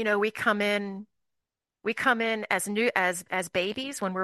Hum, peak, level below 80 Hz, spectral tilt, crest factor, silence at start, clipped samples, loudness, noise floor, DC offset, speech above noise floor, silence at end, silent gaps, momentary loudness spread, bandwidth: none; -8 dBFS; -72 dBFS; -3.5 dB/octave; 20 dB; 0 s; under 0.1%; -27 LUFS; -86 dBFS; under 0.1%; 58 dB; 0 s; none; 8 LU; 12.5 kHz